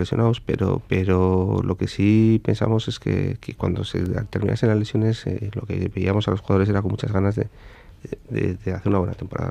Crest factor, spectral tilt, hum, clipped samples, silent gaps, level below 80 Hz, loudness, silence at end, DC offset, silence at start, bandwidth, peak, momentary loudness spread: 16 dB; -8 dB/octave; none; under 0.1%; none; -46 dBFS; -22 LUFS; 0 s; under 0.1%; 0 s; 9.2 kHz; -4 dBFS; 9 LU